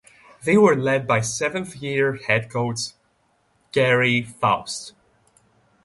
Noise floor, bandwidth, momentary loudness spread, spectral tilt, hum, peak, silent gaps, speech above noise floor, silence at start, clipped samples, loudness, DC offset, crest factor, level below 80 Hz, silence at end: -65 dBFS; 11.5 kHz; 13 LU; -4.5 dB/octave; none; -4 dBFS; none; 44 dB; 0.45 s; under 0.1%; -21 LUFS; under 0.1%; 20 dB; -58 dBFS; 0.95 s